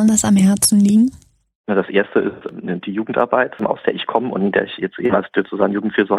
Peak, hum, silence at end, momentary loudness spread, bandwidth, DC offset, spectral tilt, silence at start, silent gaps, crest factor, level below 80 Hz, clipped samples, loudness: -2 dBFS; none; 0 s; 11 LU; 14.5 kHz; under 0.1%; -5 dB/octave; 0 s; 1.55-1.64 s; 16 dB; -52 dBFS; under 0.1%; -17 LUFS